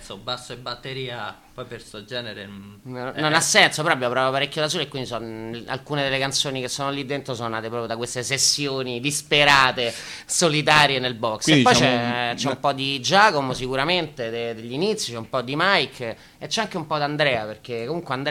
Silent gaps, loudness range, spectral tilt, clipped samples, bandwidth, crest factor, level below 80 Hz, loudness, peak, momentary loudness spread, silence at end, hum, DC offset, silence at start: none; 7 LU; -3 dB/octave; under 0.1%; 16.5 kHz; 22 dB; -54 dBFS; -21 LUFS; -2 dBFS; 17 LU; 0 s; none; under 0.1%; 0 s